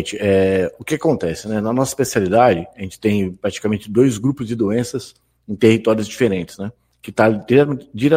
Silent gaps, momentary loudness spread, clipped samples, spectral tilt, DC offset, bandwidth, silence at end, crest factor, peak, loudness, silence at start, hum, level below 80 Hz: none; 12 LU; under 0.1%; -6 dB/octave; under 0.1%; 16 kHz; 0 s; 18 dB; 0 dBFS; -18 LUFS; 0 s; none; -50 dBFS